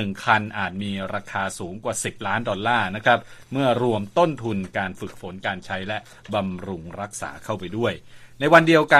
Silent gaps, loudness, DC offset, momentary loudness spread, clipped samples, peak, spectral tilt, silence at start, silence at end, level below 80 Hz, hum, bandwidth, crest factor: none; -23 LUFS; under 0.1%; 12 LU; under 0.1%; 0 dBFS; -5 dB/octave; 0 s; 0 s; -56 dBFS; none; 14 kHz; 22 dB